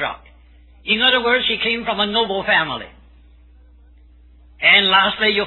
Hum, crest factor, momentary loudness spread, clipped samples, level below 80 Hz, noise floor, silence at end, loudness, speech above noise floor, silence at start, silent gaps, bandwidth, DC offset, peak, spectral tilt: none; 18 dB; 15 LU; under 0.1%; -48 dBFS; -47 dBFS; 0 s; -15 LUFS; 30 dB; 0 s; none; 4.3 kHz; under 0.1%; 0 dBFS; -5.5 dB/octave